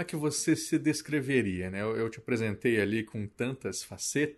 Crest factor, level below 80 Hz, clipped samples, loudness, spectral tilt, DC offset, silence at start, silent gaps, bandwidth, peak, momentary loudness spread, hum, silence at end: 16 dB; -64 dBFS; under 0.1%; -31 LUFS; -4.5 dB/octave; under 0.1%; 0 s; none; 12 kHz; -14 dBFS; 7 LU; none; 0.05 s